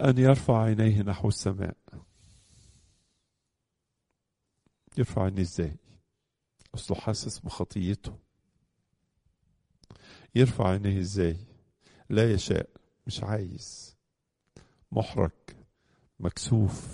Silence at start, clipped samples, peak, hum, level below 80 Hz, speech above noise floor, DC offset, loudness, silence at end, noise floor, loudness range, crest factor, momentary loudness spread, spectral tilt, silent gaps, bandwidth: 0 s; under 0.1%; -6 dBFS; none; -50 dBFS; 56 dB; under 0.1%; -28 LUFS; 0 s; -82 dBFS; 8 LU; 24 dB; 17 LU; -6.5 dB/octave; none; 11 kHz